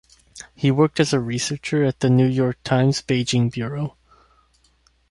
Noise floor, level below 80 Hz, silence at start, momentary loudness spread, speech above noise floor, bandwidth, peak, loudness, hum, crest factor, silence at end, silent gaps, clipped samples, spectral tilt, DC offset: -61 dBFS; -54 dBFS; 0.35 s; 10 LU; 41 dB; 11.5 kHz; -4 dBFS; -21 LUFS; none; 18 dB; 1.2 s; none; under 0.1%; -6 dB/octave; under 0.1%